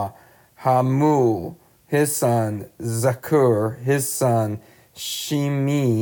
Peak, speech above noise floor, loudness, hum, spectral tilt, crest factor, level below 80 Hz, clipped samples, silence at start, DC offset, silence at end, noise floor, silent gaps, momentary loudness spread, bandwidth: -6 dBFS; 30 dB; -21 LUFS; none; -6 dB/octave; 14 dB; -62 dBFS; under 0.1%; 0 s; under 0.1%; 0 s; -50 dBFS; none; 10 LU; over 20 kHz